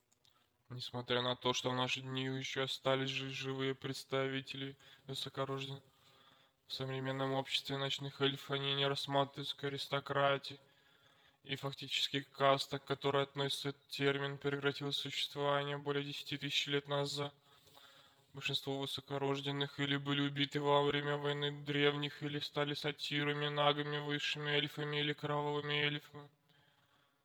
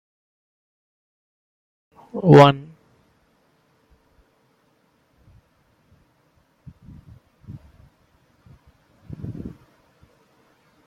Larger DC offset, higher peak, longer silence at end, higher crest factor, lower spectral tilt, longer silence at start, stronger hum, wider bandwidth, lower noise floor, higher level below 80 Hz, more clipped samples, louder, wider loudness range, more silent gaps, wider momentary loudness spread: neither; second, -16 dBFS vs 0 dBFS; second, 1 s vs 1.4 s; about the same, 24 dB vs 24 dB; second, -4.5 dB/octave vs -7.5 dB/octave; second, 0.7 s vs 2.15 s; neither; first, 19.5 kHz vs 8 kHz; first, -74 dBFS vs -63 dBFS; second, -80 dBFS vs -56 dBFS; neither; second, -37 LUFS vs -15 LUFS; second, 4 LU vs 23 LU; neither; second, 9 LU vs 32 LU